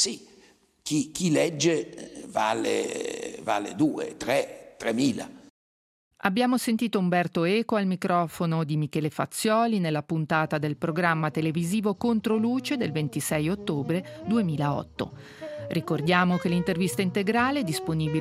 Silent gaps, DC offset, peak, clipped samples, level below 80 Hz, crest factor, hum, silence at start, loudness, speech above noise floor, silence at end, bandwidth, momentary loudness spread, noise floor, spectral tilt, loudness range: 5.50-6.11 s; under 0.1%; -6 dBFS; under 0.1%; -62 dBFS; 20 dB; none; 0 s; -26 LUFS; 33 dB; 0 s; 15.5 kHz; 9 LU; -58 dBFS; -5 dB/octave; 3 LU